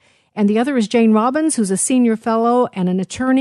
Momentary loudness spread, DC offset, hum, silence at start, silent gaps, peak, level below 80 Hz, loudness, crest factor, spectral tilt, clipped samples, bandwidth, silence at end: 6 LU; under 0.1%; none; 0.35 s; none; -4 dBFS; -58 dBFS; -16 LUFS; 12 dB; -5 dB/octave; under 0.1%; 12 kHz; 0 s